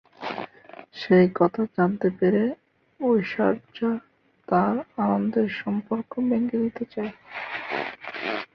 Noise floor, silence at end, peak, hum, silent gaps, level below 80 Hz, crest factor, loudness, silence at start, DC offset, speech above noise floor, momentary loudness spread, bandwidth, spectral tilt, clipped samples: -47 dBFS; 0.1 s; -6 dBFS; none; none; -64 dBFS; 18 dB; -25 LUFS; 0.2 s; under 0.1%; 23 dB; 12 LU; 6.2 kHz; -9 dB/octave; under 0.1%